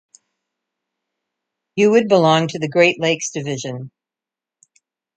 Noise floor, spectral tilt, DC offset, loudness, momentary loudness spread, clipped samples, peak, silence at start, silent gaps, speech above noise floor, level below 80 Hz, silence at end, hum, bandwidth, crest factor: -88 dBFS; -4.5 dB/octave; under 0.1%; -16 LUFS; 15 LU; under 0.1%; 0 dBFS; 1.75 s; none; 72 dB; -66 dBFS; 1.3 s; none; 9.2 kHz; 20 dB